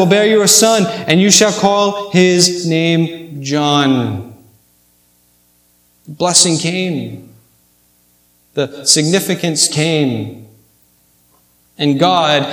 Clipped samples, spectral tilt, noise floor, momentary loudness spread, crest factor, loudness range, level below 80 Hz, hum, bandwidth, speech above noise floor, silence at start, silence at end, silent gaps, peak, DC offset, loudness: under 0.1%; -3.5 dB/octave; -54 dBFS; 13 LU; 14 dB; 6 LU; -60 dBFS; 60 Hz at -45 dBFS; 19.5 kHz; 42 dB; 0 s; 0 s; none; 0 dBFS; under 0.1%; -12 LUFS